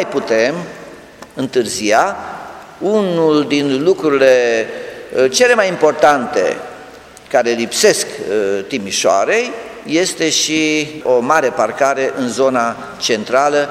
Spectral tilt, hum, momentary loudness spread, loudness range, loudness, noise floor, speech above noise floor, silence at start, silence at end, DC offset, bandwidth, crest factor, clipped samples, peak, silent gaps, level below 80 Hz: -3 dB/octave; none; 13 LU; 3 LU; -14 LUFS; -37 dBFS; 23 dB; 0 s; 0 s; under 0.1%; 16 kHz; 16 dB; under 0.1%; 0 dBFS; none; -56 dBFS